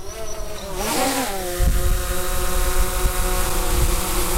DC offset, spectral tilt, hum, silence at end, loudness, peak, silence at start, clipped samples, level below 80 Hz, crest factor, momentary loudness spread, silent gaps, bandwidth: under 0.1%; -3.5 dB/octave; none; 0 s; -23 LUFS; -6 dBFS; 0 s; under 0.1%; -22 dBFS; 14 dB; 10 LU; none; 16 kHz